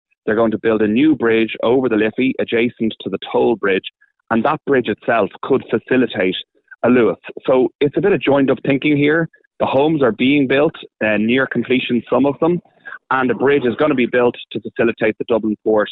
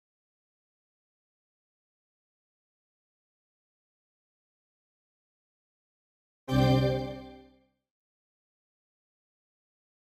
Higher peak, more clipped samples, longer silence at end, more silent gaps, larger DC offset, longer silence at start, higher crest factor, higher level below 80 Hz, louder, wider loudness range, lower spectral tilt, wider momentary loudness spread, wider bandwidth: first, -2 dBFS vs -12 dBFS; neither; second, 0 s vs 2.75 s; first, 7.75-7.79 s, 9.47-9.51 s vs none; neither; second, 0.25 s vs 6.5 s; second, 14 dB vs 24 dB; about the same, -54 dBFS vs -52 dBFS; first, -17 LUFS vs -27 LUFS; second, 2 LU vs 5 LU; first, -10 dB/octave vs -7.5 dB/octave; second, 7 LU vs 20 LU; second, 4.2 kHz vs 12.5 kHz